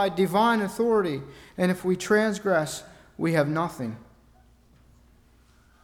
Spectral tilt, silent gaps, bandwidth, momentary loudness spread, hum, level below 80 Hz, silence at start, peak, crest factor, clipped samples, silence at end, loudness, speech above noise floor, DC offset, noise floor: -5.5 dB/octave; none; 18 kHz; 14 LU; none; -60 dBFS; 0 s; -10 dBFS; 16 dB; under 0.1%; 1.8 s; -25 LUFS; 33 dB; under 0.1%; -58 dBFS